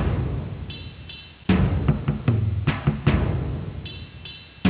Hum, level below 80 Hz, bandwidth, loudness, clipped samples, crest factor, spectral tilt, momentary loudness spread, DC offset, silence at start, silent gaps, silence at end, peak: none; -32 dBFS; 4 kHz; -24 LUFS; under 0.1%; 16 dB; -11.5 dB/octave; 15 LU; under 0.1%; 0 s; none; 0 s; -8 dBFS